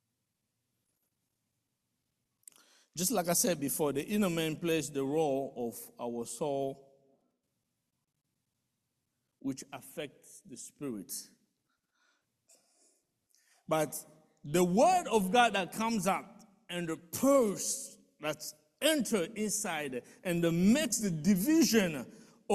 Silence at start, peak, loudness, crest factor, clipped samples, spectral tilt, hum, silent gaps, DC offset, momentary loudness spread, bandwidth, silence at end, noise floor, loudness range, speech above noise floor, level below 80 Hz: 2.95 s; -12 dBFS; -32 LUFS; 22 dB; under 0.1%; -4 dB/octave; none; none; under 0.1%; 16 LU; 14.5 kHz; 0 s; -84 dBFS; 16 LU; 52 dB; -68 dBFS